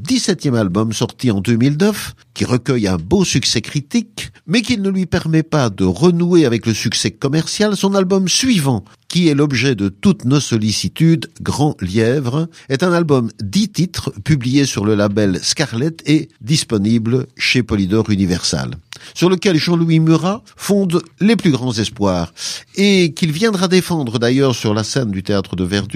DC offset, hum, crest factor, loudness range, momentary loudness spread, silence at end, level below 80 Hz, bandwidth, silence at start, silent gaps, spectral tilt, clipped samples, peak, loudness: under 0.1%; none; 14 dB; 2 LU; 7 LU; 0 s; -44 dBFS; 15.5 kHz; 0 s; none; -5 dB/octave; under 0.1%; 0 dBFS; -16 LUFS